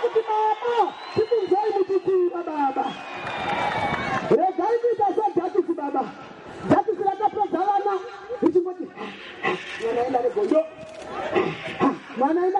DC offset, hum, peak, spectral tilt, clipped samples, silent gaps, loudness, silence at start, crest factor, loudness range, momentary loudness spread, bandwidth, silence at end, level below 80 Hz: under 0.1%; none; -6 dBFS; -6.5 dB/octave; under 0.1%; none; -24 LUFS; 0 s; 18 dB; 2 LU; 11 LU; 9.6 kHz; 0 s; -60 dBFS